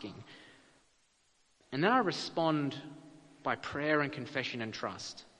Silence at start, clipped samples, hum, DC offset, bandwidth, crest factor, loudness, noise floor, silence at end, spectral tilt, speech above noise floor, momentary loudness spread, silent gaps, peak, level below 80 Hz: 0 s; under 0.1%; none; under 0.1%; 10 kHz; 24 dB; -34 LUFS; -71 dBFS; 0.15 s; -5 dB/octave; 37 dB; 22 LU; none; -12 dBFS; -72 dBFS